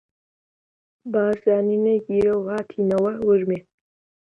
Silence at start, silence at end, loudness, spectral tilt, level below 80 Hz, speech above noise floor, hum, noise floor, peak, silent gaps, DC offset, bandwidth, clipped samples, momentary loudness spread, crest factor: 1.05 s; 0.65 s; -21 LUFS; -9 dB/octave; -58 dBFS; over 70 dB; none; under -90 dBFS; -6 dBFS; none; under 0.1%; 6 kHz; under 0.1%; 8 LU; 16 dB